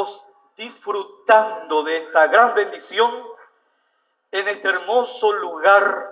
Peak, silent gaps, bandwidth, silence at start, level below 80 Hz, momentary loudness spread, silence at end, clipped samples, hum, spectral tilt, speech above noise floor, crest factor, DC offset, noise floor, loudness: 0 dBFS; none; 4 kHz; 0 s; -82 dBFS; 14 LU; 0 s; under 0.1%; none; -5.5 dB/octave; 50 dB; 20 dB; under 0.1%; -68 dBFS; -18 LUFS